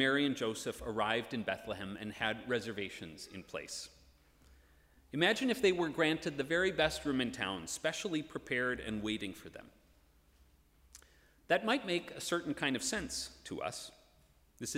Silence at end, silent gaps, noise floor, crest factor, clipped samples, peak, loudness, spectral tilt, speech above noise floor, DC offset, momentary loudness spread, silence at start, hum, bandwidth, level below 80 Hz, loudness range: 0 s; none; -67 dBFS; 22 dB; under 0.1%; -16 dBFS; -36 LUFS; -3.5 dB/octave; 31 dB; under 0.1%; 14 LU; 0 s; none; 16 kHz; -62 dBFS; 8 LU